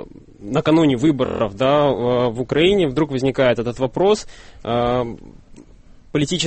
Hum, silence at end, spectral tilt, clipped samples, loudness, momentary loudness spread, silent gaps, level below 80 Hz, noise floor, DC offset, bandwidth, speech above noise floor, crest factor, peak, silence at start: none; 0 s; -6 dB/octave; under 0.1%; -18 LUFS; 10 LU; none; -42 dBFS; -44 dBFS; under 0.1%; 8.8 kHz; 26 dB; 14 dB; -4 dBFS; 0 s